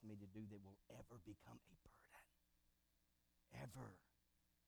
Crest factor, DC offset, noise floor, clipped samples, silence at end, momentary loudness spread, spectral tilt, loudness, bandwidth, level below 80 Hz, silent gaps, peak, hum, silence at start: 20 dB; under 0.1%; -84 dBFS; under 0.1%; 0 s; 10 LU; -6.5 dB/octave; -61 LUFS; over 20 kHz; -78 dBFS; none; -42 dBFS; 60 Hz at -85 dBFS; 0 s